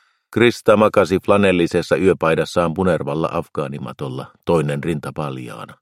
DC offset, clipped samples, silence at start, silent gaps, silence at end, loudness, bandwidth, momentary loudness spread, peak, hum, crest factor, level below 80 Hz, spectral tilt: under 0.1%; under 0.1%; 0.3 s; none; 0.1 s; -18 LUFS; 15 kHz; 14 LU; 0 dBFS; none; 18 dB; -50 dBFS; -6.5 dB/octave